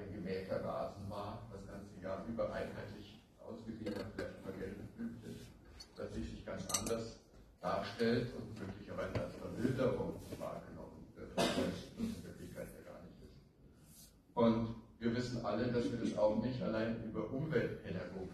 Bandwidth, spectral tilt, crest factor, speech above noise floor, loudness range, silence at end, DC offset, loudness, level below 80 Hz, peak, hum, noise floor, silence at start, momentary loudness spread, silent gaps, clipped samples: 13 kHz; -5.5 dB/octave; 20 dB; 25 dB; 8 LU; 0 s; under 0.1%; -41 LUFS; -60 dBFS; -20 dBFS; none; -63 dBFS; 0 s; 18 LU; none; under 0.1%